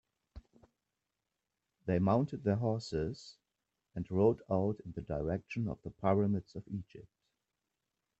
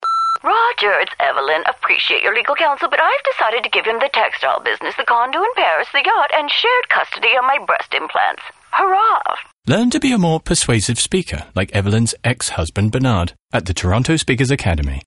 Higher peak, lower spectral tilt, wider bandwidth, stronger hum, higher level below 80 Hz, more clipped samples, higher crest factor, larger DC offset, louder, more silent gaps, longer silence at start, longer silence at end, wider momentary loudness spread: second, -16 dBFS vs -2 dBFS; first, -8.5 dB/octave vs -4 dB/octave; second, 8.2 kHz vs 11.5 kHz; neither; second, -60 dBFS vs -36 dBFS; neither; first, 20 dB vs 14 dB; neither; second, -35 LUFS vs -16 LUFS; second, none vs 9.53-9.57 s, 13.42-13.46 s; first, 0.35 s vs 0 s; first, 1.2 s vs 0.05 s; first, 14 LU vs 6 LU